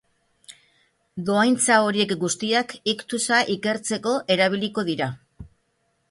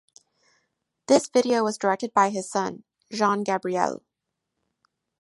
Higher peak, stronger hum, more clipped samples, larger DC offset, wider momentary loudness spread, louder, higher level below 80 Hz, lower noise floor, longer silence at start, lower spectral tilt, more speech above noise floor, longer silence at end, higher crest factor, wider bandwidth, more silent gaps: about the same, -4 dBFS vs -4 dBFS; neither; neither; neither; about the same, 9 LU vs 11 LU; about the same, -22 LUFS vs -24 LUFS; first, -60 dBFS vs -74 dBFS; second, -70 dBFS vs -83 dBFS; second, 0.5 s vs 1.1 s; about the same, -3 dB/octave vs -4 dB/octave; second, 48 dB vs 60 dB; second, 0.65 s vs 1.3 s; about the same, 20 dB vs 22 dB; about the same, 11.5 kHz vs 11.5 kHz; neither